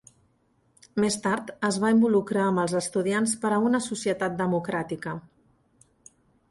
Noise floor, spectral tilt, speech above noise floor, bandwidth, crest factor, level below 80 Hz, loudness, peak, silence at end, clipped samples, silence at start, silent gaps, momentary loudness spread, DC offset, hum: -67 dBFS; -5 dB/octave; 42 dB; 11.5 kHz; 16 dB; -64 dBFS; -26 LUFS; -12 dBFS; 1.3 s; under 0.1%; 0.95 s; none; 10 LU; under 0.1%; none